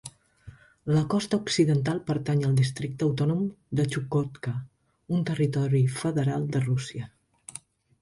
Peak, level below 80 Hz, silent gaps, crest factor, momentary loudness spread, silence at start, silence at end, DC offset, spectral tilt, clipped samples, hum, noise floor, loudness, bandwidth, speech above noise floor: -10 dBFS; -58 dBFS; none; 18 dB; 16 LU; 0.05 s; 0.45 s; under 0.1%; -6.5 dB/octave; under 0.1%; none; -50 dBFS; -27 LUFS; 11.5 kHz; 25 dB